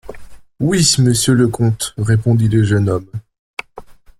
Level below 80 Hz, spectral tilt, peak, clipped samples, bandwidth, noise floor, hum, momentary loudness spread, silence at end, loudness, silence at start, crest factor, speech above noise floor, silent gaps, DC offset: -42 dBFS; -5 dB/octave; -2 dBFS; under 0.1%; 15 kHz; -38 dBFS; none; 18 LU; 0.25 s; -14 LUFS; 0.05 s; 14 dB; 24 dB; 3.39-3.57 s; under 0.1%